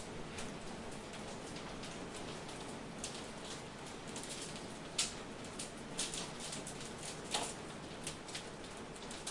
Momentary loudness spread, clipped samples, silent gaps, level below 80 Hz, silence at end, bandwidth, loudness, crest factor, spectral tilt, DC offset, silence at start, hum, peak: 8 LU; under 0.1%; none; -62 dBFS; 0 s; 11.5 kHz; -44 LUFS; 24 dB; -2.5 dB/octave; under 0.1%; 0 s; none; -20 dBFS